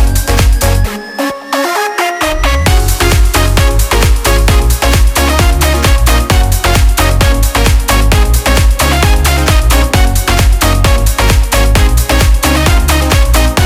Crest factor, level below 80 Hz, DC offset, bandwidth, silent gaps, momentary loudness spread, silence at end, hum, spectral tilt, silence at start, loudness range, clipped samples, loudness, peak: 8 dB; -10 dBFS; under 0.1%; 16 kHz; none; 3 LU; 0 s; none; -4 dB/octave; 0 s; 2 LU; under 0.1%; -10 LUFS; 0 dBFS